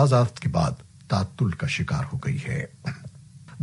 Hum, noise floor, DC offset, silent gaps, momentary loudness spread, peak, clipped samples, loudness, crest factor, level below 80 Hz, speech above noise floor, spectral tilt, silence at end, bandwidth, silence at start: none; -46 dBFS; under 0.1%; none; 17 LU; -6 dBFS; under 0.1%; -26 LUFS; 18 dB; -48 dBFS; 21 dB; -6.5 dB/octave; 0 s; 11.5 kHz; 0 s